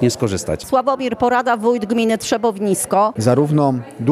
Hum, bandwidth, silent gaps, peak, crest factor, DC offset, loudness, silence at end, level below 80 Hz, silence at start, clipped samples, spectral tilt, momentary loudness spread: none; 14.5 kHz; none; -2 dBFS; 14 dB; under 0.1%; -17 LUFS; 0 s; -50 dBFS; 0 s; under 0.1%; -5.5 dB/octave; 5 LU